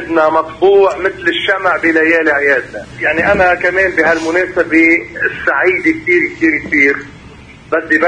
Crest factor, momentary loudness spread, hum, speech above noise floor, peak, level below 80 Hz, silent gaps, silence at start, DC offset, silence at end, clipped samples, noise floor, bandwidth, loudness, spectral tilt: 12 dB; 6 LU; none; 24 dB; 0 dBFS; -42 dBFS; none; 0 s; under 0.1%; 0 s; under 0.1%; -36 dBFS; 9.8 kHz; -12 LUFS; -5 dB/octave